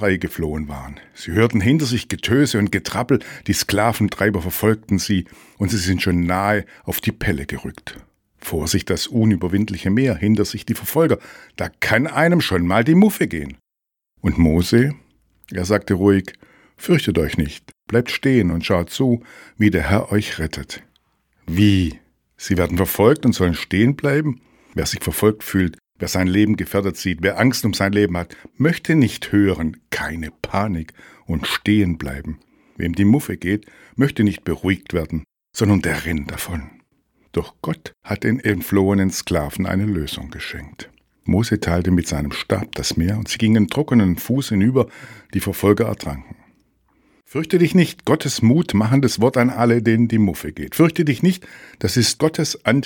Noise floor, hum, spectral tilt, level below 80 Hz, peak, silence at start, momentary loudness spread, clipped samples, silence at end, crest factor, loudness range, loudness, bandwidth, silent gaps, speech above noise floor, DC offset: -83 dBFS; none; -5.5 dB/octave; -40 dBFS; 0 dBFS; 0 s; 13 LU; under 0.1%; 0 s; 20 dB; 4 LU; -19 LUFS; 19 kHz; none; 65 dB; under 0.1%